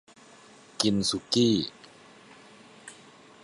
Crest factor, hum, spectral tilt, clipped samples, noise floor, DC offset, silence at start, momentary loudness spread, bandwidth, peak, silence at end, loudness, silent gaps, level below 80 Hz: 24 dB; none; -4.5 dB/octave; under 0.1%; -53 dBFS; under 0.1%; 0.8 s; 24 LU; 11.5 kHz; -8 dBFS; 0.5 s; -26 LUFS; none; -62 dBFS